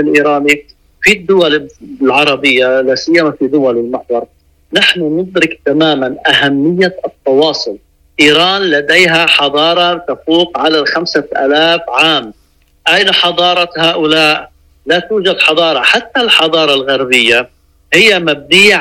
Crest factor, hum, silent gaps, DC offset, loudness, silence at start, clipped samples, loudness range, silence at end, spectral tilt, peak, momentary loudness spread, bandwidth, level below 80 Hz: 10 dB; none; none; under 0.1%; -9 LUFS; 0 s; 0.2%; 3 LU; 0 s; -3.5 dB/octave; 0 dBFS; 8 LU; 16.5 kHz; -48 dBFS